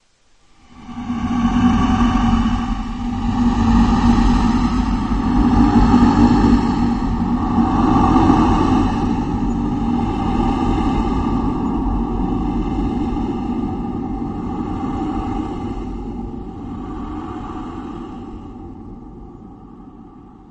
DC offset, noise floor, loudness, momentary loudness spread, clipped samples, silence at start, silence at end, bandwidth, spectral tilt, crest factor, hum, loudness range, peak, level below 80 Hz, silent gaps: under 0.1%; -54 dBFS; -18 LUFS; 17 LU; under 0.1%; 0.8 s; 0 s; 8.4 kHz; -7.5 dB/octave; 16 dB; none; 15 LU; 0 dBFS; -26 dBFS; none